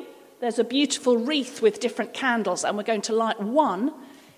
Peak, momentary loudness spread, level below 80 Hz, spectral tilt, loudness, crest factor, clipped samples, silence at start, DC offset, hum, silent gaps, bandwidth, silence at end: -8 dBFS; 6 LU; -78 dBFS; -3.5 dB/octave; -24 LUFS; 16 dB; under 0.1%; 0 s; under 0.1%; none; none; 15.5 kHz; 0.2 s